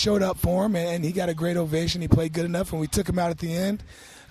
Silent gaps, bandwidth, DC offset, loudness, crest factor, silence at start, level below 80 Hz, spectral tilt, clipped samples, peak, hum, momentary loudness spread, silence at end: none; 14 kHz; under 0.1%; -25 LUFS; 22 dB; 0 s; -40 dBFS; -6 dB/octave; under 0.1%; -4 dBFS; none; 5 LU; 0.1 s